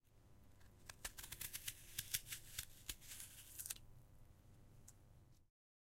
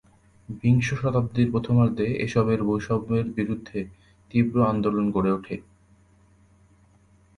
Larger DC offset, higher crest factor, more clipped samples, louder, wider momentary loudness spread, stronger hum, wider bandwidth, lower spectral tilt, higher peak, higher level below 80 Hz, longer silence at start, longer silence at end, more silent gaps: neither; first, 36 dB vs 18 dB; neither; second, -50 LUFS vs -24 LUFS; first, 23 LU vs 12 LU; neither; first, 16.5 kHz vs 10.5 kHz; second, -0.5 dB/octave vs -8 dB/octave; second, -20 dBFS vs -8 dBFS; second, -66 dBFS vs -50 dBFS; second, 0.05 s vs 0.5 s; second, 0.5 s vs 1.75 s; neither